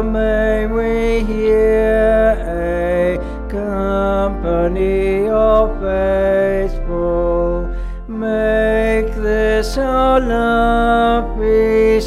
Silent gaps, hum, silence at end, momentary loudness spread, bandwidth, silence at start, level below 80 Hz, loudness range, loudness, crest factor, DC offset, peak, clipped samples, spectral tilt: none; none; 0 s; 7 LU; 12.5 kHz; 0 s; -24 dBFS; 2 LU; -16 LUFS; 12 dB; under 0.1%; -2 dBFS; under 0.1%; -7 dB/octave